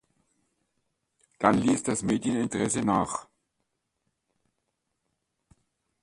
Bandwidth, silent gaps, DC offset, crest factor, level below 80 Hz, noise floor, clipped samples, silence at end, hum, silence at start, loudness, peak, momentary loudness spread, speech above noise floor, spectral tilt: 11.5 kHz; none; under 0.1%; 26 dB; -60 dBFS; -80 dBFS; under 0.1%; 2.8 s; none; 1.4 s; -27 LUFS; -4 dBFS; 5 LU; 54 dB; -5 dB/octave